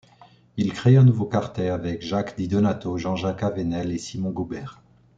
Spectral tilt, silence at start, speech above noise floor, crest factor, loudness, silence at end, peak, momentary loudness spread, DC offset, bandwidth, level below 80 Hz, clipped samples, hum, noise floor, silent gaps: -7.5 dB/octave; 0.55 s; 31 dB; 18 dB; -23 LUFS; 0.45 s; -6 dBFS; 13 LU; under 0.1%; 7.8 kHz; -54 dBFS; under 0.1%; none; -53 dBFS; none